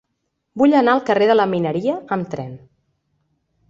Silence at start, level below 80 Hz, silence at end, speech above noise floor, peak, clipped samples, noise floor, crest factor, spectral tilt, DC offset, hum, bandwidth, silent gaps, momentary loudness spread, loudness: 0.55 s; -62 dBFS; 1.1 s; 57 dB; -2 dBFS; under 0.1%; -74 dBFS; 18 dB; -7.5 dB/octave; under 0.1%; none; 7.6 kHz; none; 15 LU; -17 LUFS